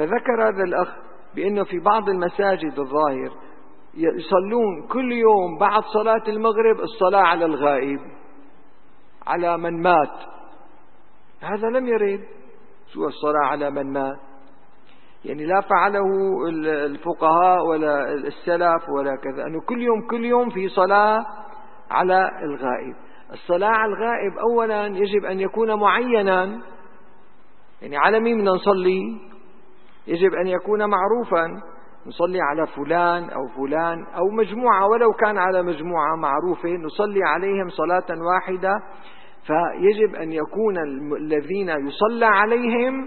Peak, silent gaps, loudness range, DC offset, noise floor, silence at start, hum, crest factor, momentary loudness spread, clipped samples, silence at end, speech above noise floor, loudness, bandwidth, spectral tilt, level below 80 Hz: 0 dBFS; none; 4 LU; 1%; -55 dBFS; 0 s; none; 20 dB; 11 LU; under 0.1%; 0 s; 35 dB; -21 LUFS; 4.4 kHz; -10.5 dB/octave; -64 dBFS